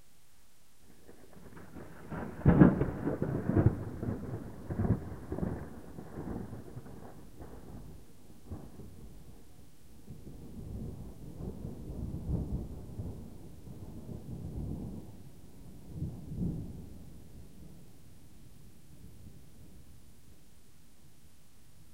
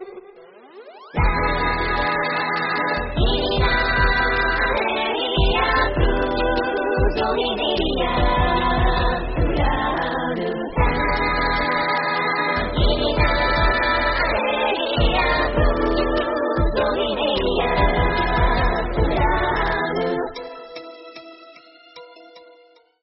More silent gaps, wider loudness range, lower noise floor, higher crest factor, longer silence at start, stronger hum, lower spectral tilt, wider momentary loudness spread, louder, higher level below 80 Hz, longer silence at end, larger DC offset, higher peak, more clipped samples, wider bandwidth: neither; first, 23 LU vs 3 LU; first, -65 dBFS vs -53 dBFS; first, 30 dB vs 16 dB; first, 0.9 s vs 0 s; neither; first, -9 dB/octave vs -3 dB/octave; first, 25 LU vs 5 LU; second, -35 LUFS vs -20 LUFS; second, -48 dBFS vs -26 dBFS; second, 0.1 s vs 0.65 s; first, 0.3% vs under 0.1%; second, -8 dBFS vs -4 dBFS; neither; first, 16 kHz vs 5.8 kHz